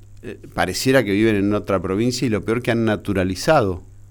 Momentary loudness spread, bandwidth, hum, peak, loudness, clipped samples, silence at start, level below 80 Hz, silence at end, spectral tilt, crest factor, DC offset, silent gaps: 10 LU; over 20 kHz; none; -4 dBFS; -19 LUFS; under 0.1%; 0 s; -42 dBFS; 0.05 s; -5.5 dB/octave; 16 dB; under 0.1%; none